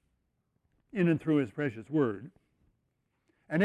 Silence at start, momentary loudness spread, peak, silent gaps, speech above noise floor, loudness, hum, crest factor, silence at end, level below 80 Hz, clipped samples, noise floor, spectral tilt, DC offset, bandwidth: 0.95 s; 9 LU; -14 dBFS; none; 49 dB; -31 LUFS; none; 20 dB; 0 s; -70 dBFS; under 0.1%; -78 dBFS; -9 dB/octave; under 0.1%; 9.8 kHz